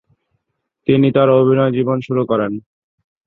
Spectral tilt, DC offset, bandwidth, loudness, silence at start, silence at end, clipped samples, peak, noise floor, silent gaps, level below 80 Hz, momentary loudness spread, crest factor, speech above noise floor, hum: -10 dB/octave; under 0.1%; 4.2 kHz; -15 LUFS; 0.9 s; 0.7 s; under 0.1%; -2 dBFS; -74 dBFS; none; -56 dBFS; 12 LU; 16 dB; 60 dB; none